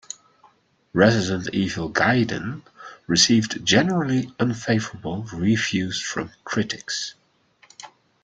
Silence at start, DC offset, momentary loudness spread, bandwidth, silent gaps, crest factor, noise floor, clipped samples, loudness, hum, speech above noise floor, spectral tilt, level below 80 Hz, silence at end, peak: 0.95 s; under 0.1%; 20 LU; 9.4 kHz; none; 20 dB; -59 dBFS; under 0.1%; -22 LUFS; none; 37 dB; -4 dB/octave; -56 dBFS; 0.35 s; -2 dBFS